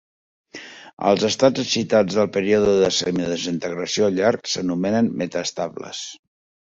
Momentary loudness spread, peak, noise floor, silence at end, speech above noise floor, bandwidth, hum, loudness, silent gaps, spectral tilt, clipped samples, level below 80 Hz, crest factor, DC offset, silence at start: 15 LU; -2 dBFS; -40 dBFS; 0.5 s; 20 dB; 7.8 kHz; none; -20 LUFS; 0.93-0.97 s; -4.5 dB/octave; under 0.1%; -56 dBFS; 20 dB; under 0.1%; 0.55 s